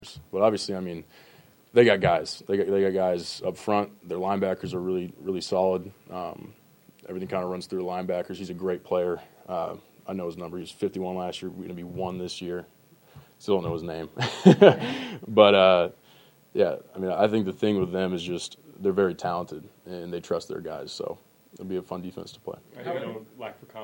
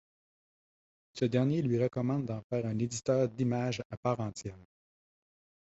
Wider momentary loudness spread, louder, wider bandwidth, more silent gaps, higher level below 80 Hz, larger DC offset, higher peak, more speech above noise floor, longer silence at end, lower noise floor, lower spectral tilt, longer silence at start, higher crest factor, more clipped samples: first, 19 LU vs 8 LU; first, -26 LUFS vs -32 LUFS; first, 16.5 kHz vs 8.2 kHz; second, none vs 2.44-2.50 s, 3.85-3.90 s, 3.97-4.03 s; about the same, -62 dBFS vs -64 dBFS; neither; first, 0 dBFS vs -16 dBFS; second, 30 dB vs over 58 dB; second, 0 s vs 1 s; second, -56 dBFS vs under -90 dBFS; about the same, -6 dB/octave vs -6.5 dB/octave; second, 0 s vs 1.15 s; first, 26 dB vs 18 dB; neither